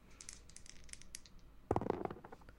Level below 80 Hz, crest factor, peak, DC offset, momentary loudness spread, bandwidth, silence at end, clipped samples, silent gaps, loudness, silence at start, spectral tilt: -60 dBFS; 28 dB; -18 dBFS; under 0.1%; 17 LU; 16.5 kHz; 0 s; under 0.1%; none; -45 LUFS; 0 s; -5.5 dB/octave